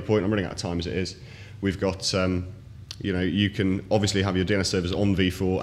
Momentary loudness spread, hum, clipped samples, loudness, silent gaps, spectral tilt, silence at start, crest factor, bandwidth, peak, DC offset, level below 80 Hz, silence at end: 10 LU; none; under 0.1%; -25 LUFS; none; -5.5 dB/octave; 0 s; 16 dB; 13.5 kHz; -8 dBFS; under 0.1%; -46 dBFS; 0 s